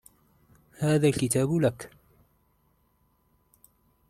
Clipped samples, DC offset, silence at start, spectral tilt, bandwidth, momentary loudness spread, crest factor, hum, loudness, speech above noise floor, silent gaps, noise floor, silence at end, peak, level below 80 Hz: under 0.1%; under 0.1%; 0.8 s; -6 dB/octave; 14.5 kHz; 17 LU; 18 dB; 50 Hz at -50 dBFS; -25 LUFS; 44 dB; none; -68 dBFS; 2.2 s; -12 dBFS; -60 dBFS